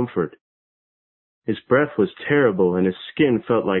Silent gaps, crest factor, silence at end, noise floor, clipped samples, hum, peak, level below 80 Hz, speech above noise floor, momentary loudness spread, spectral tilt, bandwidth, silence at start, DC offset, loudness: 0.41-1.42 s; 16 dB; 0 s; under -90 dBFS; under 0.1%; none; -4 dBFS; -56 dBFS; over 70 dB; 10 LU; -11.5 dB/octave; 4.2 kHz; 0 s; under 0.1%; -20 LUFS